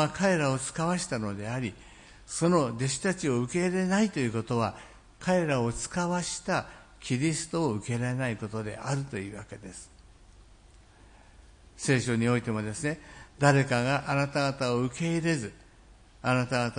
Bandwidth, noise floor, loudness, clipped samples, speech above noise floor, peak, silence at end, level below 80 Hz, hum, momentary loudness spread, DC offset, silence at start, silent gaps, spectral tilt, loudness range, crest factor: 10.5 kHz; -55 dBFS; -29 LUFS; under 0.1%; 27 dB; -8 dBFS; 0 s; -56 dBFS; none; 12 LU; under 0.1%; 0 s; none; -5.5 dB/octave; 7 LU; 22 dB